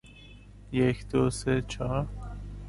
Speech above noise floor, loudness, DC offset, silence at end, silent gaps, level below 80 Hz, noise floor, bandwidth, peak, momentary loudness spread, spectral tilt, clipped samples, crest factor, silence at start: 22 dB; -29 LUFS; under 0.1%; 0 s; none; -42 dBFS; -50 dBFS; 11.5 kHz; -12 dBFS; 15 LU; -6.5 dB/octave; under 0.1%; 18 dB; 0.05 s